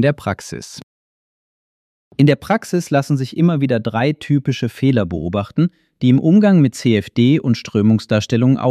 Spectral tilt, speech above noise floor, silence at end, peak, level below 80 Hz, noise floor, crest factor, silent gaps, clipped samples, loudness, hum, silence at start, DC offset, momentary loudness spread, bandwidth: -7 dB/octave; over 75 dB; 0 s; 0 dBFS; -50 dBFS; under -90 dBFS; 16 dB; 0.83-2.11 s; under 0.1%; -16 LUFS; none; 0 s; under 0.1%; 9 LU; 13.5 kHz